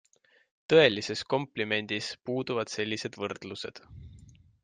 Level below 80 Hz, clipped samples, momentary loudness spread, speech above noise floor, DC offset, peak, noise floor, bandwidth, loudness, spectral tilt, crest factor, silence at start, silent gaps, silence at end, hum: -64 dBFS; under 0.1%; 19 LU; 26 dB; under 0.1%; -8 dBFS; -55 dBFS; 9.6 kHz; -29 LUFS; -4.5 dB/octave; 22 dB; 0.7 s; none; 0.35 s; none